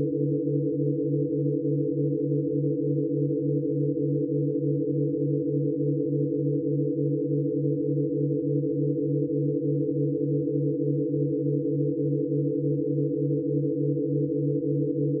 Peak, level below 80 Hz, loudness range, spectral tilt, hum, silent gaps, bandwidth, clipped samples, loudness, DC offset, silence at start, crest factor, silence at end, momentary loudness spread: -14 dBFS; -70 dBFS; 0 LU; -20.5 dB/octave; none; none; 0.6 kHz; under 0.1%; -26 LUFS; under 0.1%; 0 s; 12 dB; 0 s; 1 LU